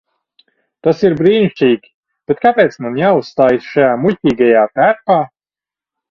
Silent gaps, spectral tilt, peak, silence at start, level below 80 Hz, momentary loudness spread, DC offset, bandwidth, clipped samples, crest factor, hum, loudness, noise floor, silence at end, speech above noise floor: 1.94-2.03 s; -7.5 dB/octave; 0 dBFS; 0.85 s; -54 dBFS; 5 LU; under 0.1%; 7 kHz; under 0.1%; 14 dB; none; -13 LUFS; under -90 dBFS; 0.85 s; over 78 dB